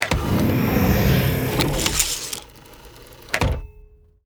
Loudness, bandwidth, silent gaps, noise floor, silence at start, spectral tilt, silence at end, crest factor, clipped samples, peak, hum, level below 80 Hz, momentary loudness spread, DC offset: -21 LUFS; over 20 kHz; none; -48 dBFS; 0 s; -4.5 dB/octave; 0.45 s; 22 dB; under 0.1%; 0 dBFS; none; -32 dBFS; 9 LU; under 0.1%